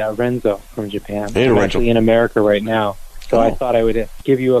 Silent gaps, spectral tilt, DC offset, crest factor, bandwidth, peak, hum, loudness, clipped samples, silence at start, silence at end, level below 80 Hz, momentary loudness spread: none; -6.5 dB/octave; under 0.1%; 12 dB; 14.5 kHz; -4 dBFS; none; -17 LUFS; under 0.1%; 0 s; 0 s; -30 dBFS; 10 LU